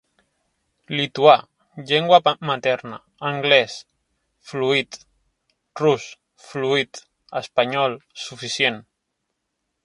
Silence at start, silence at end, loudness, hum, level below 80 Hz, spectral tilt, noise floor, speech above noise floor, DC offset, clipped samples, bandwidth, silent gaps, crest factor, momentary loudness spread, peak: 0.9 s; 1.05 s; -20 LUFS; none; -68 dBFS; -4 dB/octave; -77 dBFS; 57 dB; under 0.1%; under 0.1%; 11.5 kHz; none; 22 dB; 22 LU; 0 dBFS